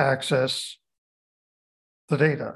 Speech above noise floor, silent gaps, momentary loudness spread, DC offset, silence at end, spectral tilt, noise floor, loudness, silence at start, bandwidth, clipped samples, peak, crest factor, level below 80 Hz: over 66 dB; 0.98-2.08 s; 8 LU; under 0.1%; 0 s; -5 dB/octave; under -90 dBFS; -24 LUFS; 0 s; 12.5 kHz; under 0.1%; -6 dBFS; 20 dB; -68 dBFS